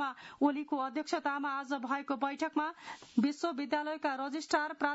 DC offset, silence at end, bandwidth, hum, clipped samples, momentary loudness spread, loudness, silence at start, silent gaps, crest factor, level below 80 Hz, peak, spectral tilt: under 0.1%; 0 s; 7.6 kHz; none; under 0.1%; 5 LU; -35 LUFS; 0 s; none; 18 dB; -80 dBFS; -16 dBFS; -2.5 dB/octave